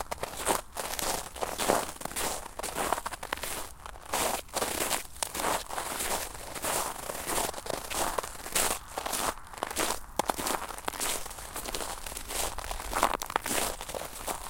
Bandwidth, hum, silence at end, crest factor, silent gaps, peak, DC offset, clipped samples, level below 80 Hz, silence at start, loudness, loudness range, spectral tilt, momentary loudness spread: 17 kHz; none; 0 s; 28 dB; none; -4 dBFS; under 0.1%; under 0.1%; -48 dBFS; 0 s; -32 LUFS; 1 LU; -1.5 dB/octave; 7 LU